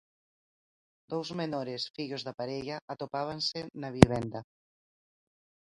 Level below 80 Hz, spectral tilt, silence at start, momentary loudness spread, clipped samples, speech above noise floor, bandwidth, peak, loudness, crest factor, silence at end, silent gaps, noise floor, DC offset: -50 dBFS; -6 dB/octave; 1.1 s; 16 LU; under 0.1%; over 59 dB; 11.5 kHz; 0 dBFS; -31 LUFS; 32 dB; 1.25 s; 1.90-1.94 s, 2.82-2.88 s; under -90 dBFS; under 0.1%